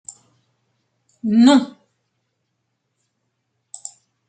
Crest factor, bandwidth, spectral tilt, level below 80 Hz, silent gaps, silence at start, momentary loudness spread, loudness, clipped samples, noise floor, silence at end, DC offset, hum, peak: 20 dB; 9.2 kHz; -4.5 dB/octave; -70 dBFS; none; 1.25 s; 24 LU; -15 LUFS; under 0.1%; -74 dBFS; 2.65 s; under 0.1%; none; -2 dBFS